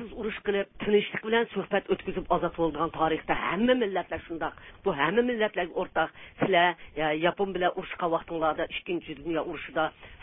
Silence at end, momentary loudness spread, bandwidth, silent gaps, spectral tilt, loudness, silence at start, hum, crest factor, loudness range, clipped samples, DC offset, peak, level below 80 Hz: 0 s; 8 LU; 3.9 kHz; none; -9.5 dB/octave; -28 LUFS; 0 s; none; 18 dB; 2 LU; under 0.1%; under 0.1%; -10 dBFS; -54 dBFS